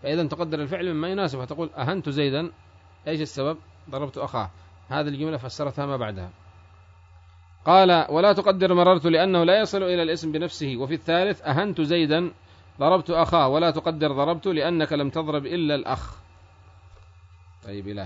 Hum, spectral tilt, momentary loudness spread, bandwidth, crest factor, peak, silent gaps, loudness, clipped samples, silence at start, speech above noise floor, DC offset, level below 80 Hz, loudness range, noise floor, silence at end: none; -6.5 dB/octave; 13 LU; 7.8 kHz; 20 dB; -4 dBFS; none; -23 LUFS; under 0.1%; 0 s; 28 dB; under 0.1%; -54 dBFS; 11 LU; -51 dBFS; 0 s